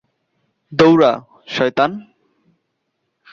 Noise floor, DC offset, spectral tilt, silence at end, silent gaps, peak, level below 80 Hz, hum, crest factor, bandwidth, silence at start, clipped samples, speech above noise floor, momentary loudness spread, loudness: -72 dBFS; under 0.1%; -6.5 dB/octave; 1.3 s; none; -2 dBFS; -56 dBFS; none; 18 dB; 7.2 kHz; 0.7 s; under 0.1%; 58 dB; 16 LU; -15 LUFS